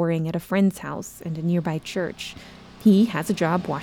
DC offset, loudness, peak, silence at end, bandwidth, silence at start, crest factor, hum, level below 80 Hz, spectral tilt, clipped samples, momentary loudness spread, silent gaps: under 0.1%; -23 LUFS; -6 dBFS; 0 s; 17.5 kHz; 0 s; 16 dB; none; -56 dBFS; -6.5 dB/octave; under 0.1%; 14 LU; none